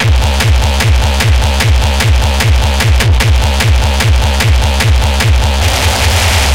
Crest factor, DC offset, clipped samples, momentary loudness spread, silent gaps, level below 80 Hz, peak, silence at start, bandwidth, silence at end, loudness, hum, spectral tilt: 8 dB; 0.9%; under 0.1%; 1 LU; none; -12 dBFS; 0 dBFS; 0 s; 16.5 kHz; 0 s; -10 LUFS; none; -4 dB/octave